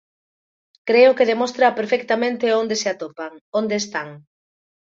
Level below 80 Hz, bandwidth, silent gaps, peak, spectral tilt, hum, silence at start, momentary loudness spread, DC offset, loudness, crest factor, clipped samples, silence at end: -70 dBFS; 7.6 kHz; 3.41-3.52 s; -2 dBFS; -3.5 dB/octave; none; 0.85 s; 16 LU; under 0.1%; -19 LUFS; 18 dB; under 0.1%; 0.65 s